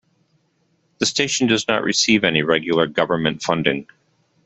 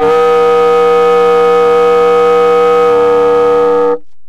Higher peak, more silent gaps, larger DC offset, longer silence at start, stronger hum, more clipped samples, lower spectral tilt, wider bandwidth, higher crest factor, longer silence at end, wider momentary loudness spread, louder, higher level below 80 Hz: about the same, -2 dBFS vs -2 dBFS; neither; neither; first, 1 s vs 0 s; neither; neither; second, -3.5 dB/octave vs -5 dB/octave; about the same, 8.4 kHz vs 9 kHz; first, 18 dB vs 6 dB; first, 0.65 s vs 0 s; first, 5 LU vs 1 LU; second, -18 LUFS vs -8 LUFS; second, -58 dBFS vs -42 dBFS